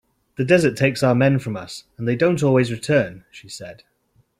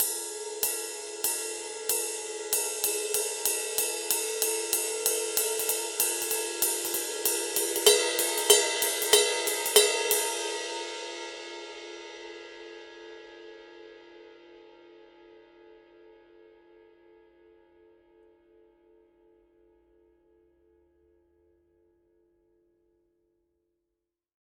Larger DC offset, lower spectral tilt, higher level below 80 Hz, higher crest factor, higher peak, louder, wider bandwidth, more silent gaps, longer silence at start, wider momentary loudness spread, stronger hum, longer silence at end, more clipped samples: neither; first, -6.5 dB/octave vs 1.5 dB/octave; first, -56 dBFS vs -74 dBFS; second, 18 dB vs 28 dB; about the same, -2 dBFS vs -2 dBFS; first, -19 LUFS vs -26 LUFS; second, 14 kHz vs 18 kHz; neither; first, 0.4 s vs 0 s; second, 19 LU vs 22 LU; neither; second, 0.65 s vs 8.65 s; neither